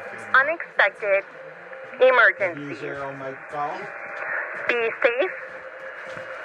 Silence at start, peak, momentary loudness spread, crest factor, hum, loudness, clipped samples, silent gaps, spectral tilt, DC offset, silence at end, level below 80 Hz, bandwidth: 0 s; -4 dBFS; 19 LU; 20 dB; none; -22 LUFS; under 0.1%; none; -4.5 dB/octave; under 0.1%; 0 s; -74 dBFS; 10 kHz